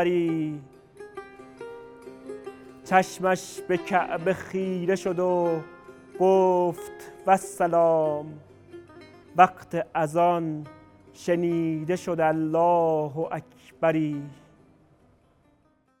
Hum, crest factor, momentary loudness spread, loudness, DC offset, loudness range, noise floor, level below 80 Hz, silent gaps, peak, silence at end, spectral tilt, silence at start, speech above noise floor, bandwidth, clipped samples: none; 24 dB; 22 LU; -25 LUFS; under 0.1%; 5 LU; -64 dBFS; -66 dBFS; none; -2 dBFS; 1.65 s; -6.5 dB/octave; 0 s; 40 dB; 16 kHz; under 0.1%